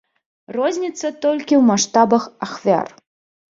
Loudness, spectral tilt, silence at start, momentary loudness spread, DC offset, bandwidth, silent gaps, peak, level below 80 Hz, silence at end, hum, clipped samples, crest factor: -18 LUFS; -4.5 dB/octave; 0.5 s; 12 LU; under 0.1%; 7.8 kHz; none; -2 dBFS; -64 dBFS; 0.65 s; none; under 0.1%; 16 dB